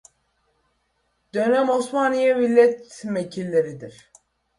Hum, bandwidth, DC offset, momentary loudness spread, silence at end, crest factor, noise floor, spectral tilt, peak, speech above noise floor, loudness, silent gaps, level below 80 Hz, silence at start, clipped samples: none; 11.5 kHz; under 0.1%; 14 LU; 0.7 s; 18 dB; -70 dBFS; -5.5 dB/octave; -4 dBFS; 50 dB; -21 LUFS; none; -66 dBFS; 1.35 s; under 0.1%